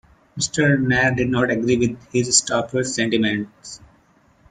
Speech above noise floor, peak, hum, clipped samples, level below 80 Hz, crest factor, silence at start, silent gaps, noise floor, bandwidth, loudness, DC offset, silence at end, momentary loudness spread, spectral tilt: 37 dB; 0 dBFS; none; under 0.1%; -50 dBFS; 20 dB; 0.35 s; none; -57 dBFS; 9.6 kHz; -19 LUFS; under 0.1%; 0.75 s; 18 LU; -4 dB/octave